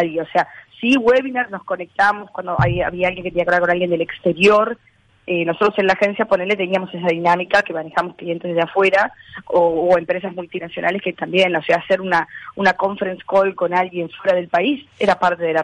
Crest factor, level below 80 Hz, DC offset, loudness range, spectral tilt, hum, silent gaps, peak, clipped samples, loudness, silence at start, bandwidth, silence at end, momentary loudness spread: 14 dB; -48 dBFS; under 0.1%; 1 LU; -6 dB/octave; none; none; -4 dBFS; under 0.1%; -18 LUFS; 0 s; 10.5 kHz; 0 s; 9 LU